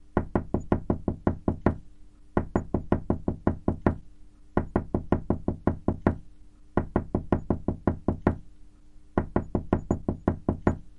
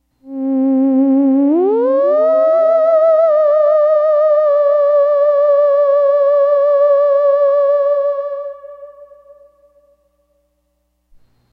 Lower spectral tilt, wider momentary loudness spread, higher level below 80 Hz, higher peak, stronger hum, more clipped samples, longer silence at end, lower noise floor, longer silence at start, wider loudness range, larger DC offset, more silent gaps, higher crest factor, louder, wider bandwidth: first, -10 dB/octave vs -7.5 dB/octave; about the same, 4 LU vs 6 LU; first, -40 dBFS vs -66 dBFS; about the same, -4 dBFS vs -4 dBFS; neither; neither; second, 0 s vs 2.5 s; second, -49 dBFS vs -65 dBFS; second, 0 s vs 0.25 s; second, 1 LU vs 7 LU; neither; neither; first, 24 dB vs 8 dB; second, -29 LUFS vs -12 LUFS; first, 7.4 kHz vs 4.6 kHz